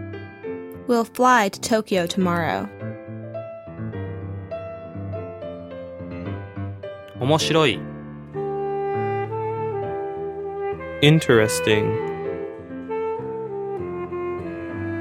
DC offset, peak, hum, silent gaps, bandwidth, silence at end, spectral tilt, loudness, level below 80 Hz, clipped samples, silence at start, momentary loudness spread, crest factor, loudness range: under 0.1%; -2 dBFS; none; none; 16 kHz; 0 s; -5 dB/octave; -24 LUFS; -54 dBFS; under 0.1%; 0 s; 17 LU; 22 dB; 12 LU